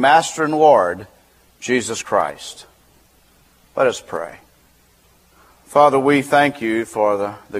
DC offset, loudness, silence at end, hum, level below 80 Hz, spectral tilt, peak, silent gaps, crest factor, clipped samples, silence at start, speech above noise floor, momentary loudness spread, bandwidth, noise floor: under 0.1%; -17 LUFS; 0 s; none; -60 dBFS; -4 dB/octave; 0 dBFS; none; 18 dB; under 0.1%; 0 s; 38 dB; 18 LU; 15.5 kHz; -54 dBFS